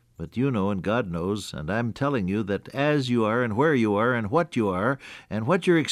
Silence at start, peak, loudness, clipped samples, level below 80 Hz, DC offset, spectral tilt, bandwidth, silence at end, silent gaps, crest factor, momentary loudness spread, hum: 0.2 s; -10 dBFS; -25 LUFS; under 0.1%; -54 dBFS; under 0.1%; -6.5 dB/octave; 13.5 kHz; 0 s; none; 16 dB; 8 LU; none